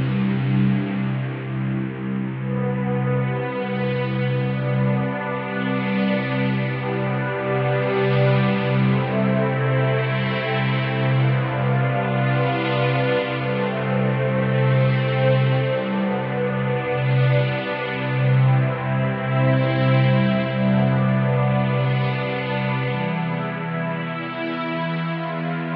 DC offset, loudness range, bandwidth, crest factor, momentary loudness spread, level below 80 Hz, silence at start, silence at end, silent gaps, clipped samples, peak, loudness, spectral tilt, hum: under 0.1%; 4 LU; 4.9 kHz; 14 dB; 7 LU; -56 dBFS; 0 s; 0 s; none; under 0.1%; -8 dBFS; -21 LUFS; -6.5 dB/octave; none